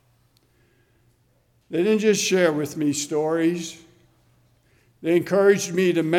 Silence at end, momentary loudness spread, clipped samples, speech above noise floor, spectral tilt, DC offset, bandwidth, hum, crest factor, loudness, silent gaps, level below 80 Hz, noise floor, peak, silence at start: 0 s; 10 LU; under 0.1%; 43 dB; -4.5 dB/octave; under 0.1%; 16.5 kHz; none; 18 dB; -21 LUFS; none; -68 dBFS; -63 dBFS; -4 dBFS; 1.7 s